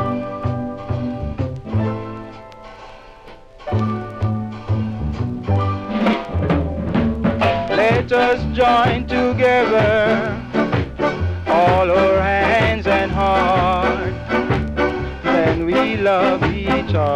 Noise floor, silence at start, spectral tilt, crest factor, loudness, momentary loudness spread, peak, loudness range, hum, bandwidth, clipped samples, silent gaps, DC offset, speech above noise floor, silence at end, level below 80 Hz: -40 dBFS; 0 s; -7.5 dB/octave; 12 dB; -18 LUFS; 10 LU; -6 dBFS; 9 LU; none; 9.8 kHz; under 0.1%; none; under 0.1%; 25 dB; 0 s; -32 dBFS